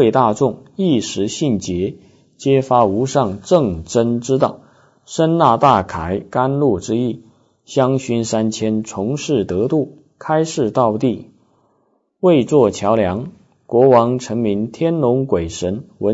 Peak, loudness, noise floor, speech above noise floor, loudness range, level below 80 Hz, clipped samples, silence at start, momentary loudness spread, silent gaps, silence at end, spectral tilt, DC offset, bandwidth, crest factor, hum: 0 dBFS; -17 LUFS; -62 dBFS; 46 dB; 3 LU; -48 dBFS; under 0.1%; 0 s; 9 LU; none; 0 s; -6.5 dB/octave; under 0.1%; 8 kHz; 16 dB; none